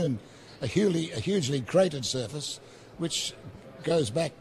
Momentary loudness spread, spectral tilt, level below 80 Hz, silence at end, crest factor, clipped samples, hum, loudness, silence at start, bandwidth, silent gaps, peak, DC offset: 16 LU; -5 dB/octave; -60 dBFS; 0.05 s; 18 dB; under 0.1%; none; -29 LUFS; 0 s; 13.5 kHz; none; -12 dBFS; under 0.1%